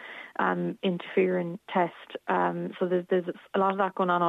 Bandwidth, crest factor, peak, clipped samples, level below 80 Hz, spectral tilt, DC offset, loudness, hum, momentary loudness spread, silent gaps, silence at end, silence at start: 4 kHz; 16 dB; -12 dBFS; under 0.1%; -80 dBFS; -8.5 dB/octave; under 0.1%; -28 LUFS; none; 6 LU; none; 0 s; 0 s